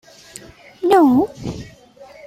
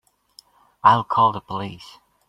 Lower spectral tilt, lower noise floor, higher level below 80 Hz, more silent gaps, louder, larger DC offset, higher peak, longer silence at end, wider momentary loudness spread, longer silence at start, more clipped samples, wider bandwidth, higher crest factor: about the same, -6.5 dB/octave vs -6 dB/octave; second, -43 dBFS vs -53 dBFS; first, -48 dBFS vs -62 dBFS; neither; first, -15 LUFS vs -19 LUFS; neither; about the same, -4 dBFS vs -2 dBFS; second, 0 s vs 0.45 s; first, 26 LU vs 17 LU; about the same, 0.8 s vs 0.85 s; neither; first, 15.5 kHz vs 11 kHz; about the same, 16 dB vs 20 dB